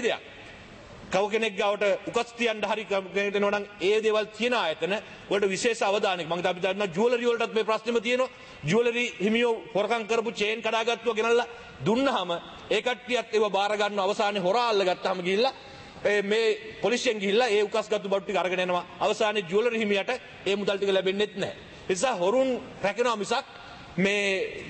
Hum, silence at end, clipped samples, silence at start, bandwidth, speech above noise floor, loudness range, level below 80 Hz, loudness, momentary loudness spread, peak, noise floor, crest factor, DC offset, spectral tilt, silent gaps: none; 0 s; under 0.1%; 0 s; 8.8 kHz; 20 dB; 1 LU; -64 dBFS; -26 LUFS; 7 LU; -12 dBFS; -46 dBFS; 16 dB; under 0.1%; -4 dB/octave; none